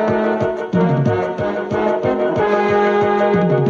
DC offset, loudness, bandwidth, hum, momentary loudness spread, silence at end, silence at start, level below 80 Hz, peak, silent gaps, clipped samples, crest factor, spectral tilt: under 0.1%; -17 LUFS; 7.4 kHz; none; 5 LU; 0 s; 0 s; -48 dBFS; -4 dBFS; none; under 0.1%; 12 dB; -8 dB/octave